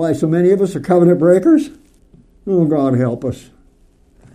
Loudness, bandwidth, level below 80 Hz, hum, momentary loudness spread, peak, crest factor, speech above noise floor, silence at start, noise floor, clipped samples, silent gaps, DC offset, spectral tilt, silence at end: -14 LUFS; 11.5 kHz; -50 dBFS; none; 15 LU; 0 dBFS; 14 dB; 38 dB; 0 s; -51 dBFS; under 0.1%; none; under 0.1%; -8.5 dB/octave; 0.95 s